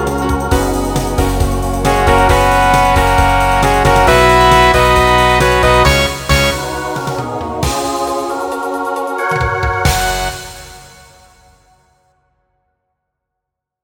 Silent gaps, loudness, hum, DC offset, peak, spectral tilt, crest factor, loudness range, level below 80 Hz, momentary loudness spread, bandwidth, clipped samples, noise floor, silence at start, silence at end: none; -12 LUFS; none; under 0.1%; 0 dBFS; -4.5 dB/octave; 14 dB; 9 LU; -22 dBFS; 11 LU; 18.5 kHz; under 0.1%; -79 dBFS; 0 s; 3 s